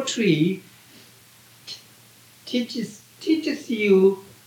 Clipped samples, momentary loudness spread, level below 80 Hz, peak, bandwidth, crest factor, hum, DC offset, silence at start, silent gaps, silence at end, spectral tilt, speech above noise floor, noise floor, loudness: under 0.1%; 21 LU; -76 dBFS; -8 dBFS; 18 kHz; 18 dB; none; under 0.1%; 0 s; none; 0.2 s; -5.5 dB/octave; 30 dB; -52 dBFS; -22 LUFS